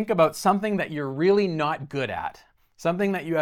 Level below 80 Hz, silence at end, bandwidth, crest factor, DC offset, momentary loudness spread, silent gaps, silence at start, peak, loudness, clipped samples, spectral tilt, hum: -62 dBFS; 0 s; 16.5 kHz; 18 dB; under 0.1%; 9 LU; none; 0 s; -6 dBFS; -24 LUFS; under 0.1%; -6 dB/octave; none